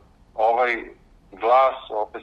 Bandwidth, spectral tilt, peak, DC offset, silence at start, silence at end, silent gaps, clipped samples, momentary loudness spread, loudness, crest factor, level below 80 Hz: 7 kHz; -4.5 dB/octave; -6 dBFS; under 0.1%; 0.35 s; 0 s; none; under 0.1%; 11 LU; -21 LUFS; 18 dB; -56 dBFS